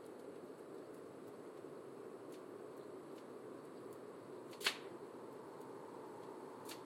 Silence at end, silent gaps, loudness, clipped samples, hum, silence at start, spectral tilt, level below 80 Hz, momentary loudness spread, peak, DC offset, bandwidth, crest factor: 0 s; none; -50 LUFS; under 0.1%; none; 0 s; -3 dB/octave; under -90 dBFS; 11 LU; -20 dBFS; under 0.1%; 16.5 kHz; 30 dB